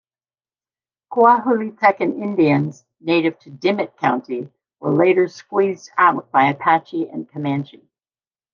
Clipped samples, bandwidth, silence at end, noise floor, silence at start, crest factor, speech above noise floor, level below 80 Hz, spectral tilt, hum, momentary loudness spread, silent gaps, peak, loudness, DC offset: under 0.1%; 7.2 kHz; 0.9 s; under -90 dBFS; 1.1 s; 18 dB; over 72 dB; -70 dBFS; -7 dB/octave; none; 13 LU; none; -2 dBFS; -18 LUFS; under 0.1%